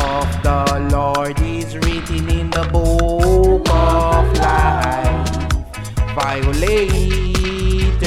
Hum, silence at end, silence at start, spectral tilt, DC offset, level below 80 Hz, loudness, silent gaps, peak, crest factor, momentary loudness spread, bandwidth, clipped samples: none; 0 s; 0 s; -6 dB/octave; under 0.1%; -18 dBFS; -17 LUFS; none; -2 dBFS; 14 dB; 7 LU; 15 kHz; under 0.1%